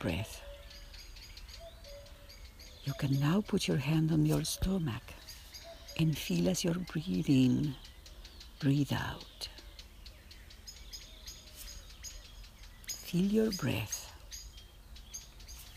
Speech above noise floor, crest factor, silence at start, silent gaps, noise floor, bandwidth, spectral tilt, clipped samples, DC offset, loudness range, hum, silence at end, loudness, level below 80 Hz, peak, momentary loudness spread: 21 dB; 18 dB; 0 s; none; -53 dBFS; 15.5 kHz; -5.5 dB/octave; under 0.1%; under 0.1%; 11 LU; none; 0 s; -33 LUFS; -50 dBFS; -18 dBFS; 22 LU